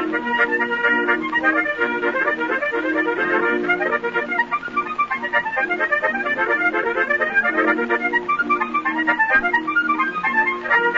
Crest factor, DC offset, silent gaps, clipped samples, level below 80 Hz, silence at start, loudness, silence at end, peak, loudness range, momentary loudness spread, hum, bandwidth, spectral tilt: 14 dB; under 0.1%; none; under 0.1%; -56 dBFS; 0 s; -19 LUFS; 0 s; -6 dBFS; 2 LU; 4 LU; none; 7.6 kHz; -5 dB/octave